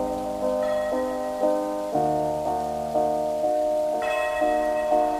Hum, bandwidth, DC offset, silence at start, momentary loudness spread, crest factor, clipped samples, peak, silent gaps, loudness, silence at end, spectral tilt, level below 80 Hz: none; 15.5 kHz; under 0.1%; 0 s; 4 LU; 14 dB; under 0.1%; -10 dBFS; none; -25 LUFS; 0 s; -5.5 dB/octave; -50 dBFS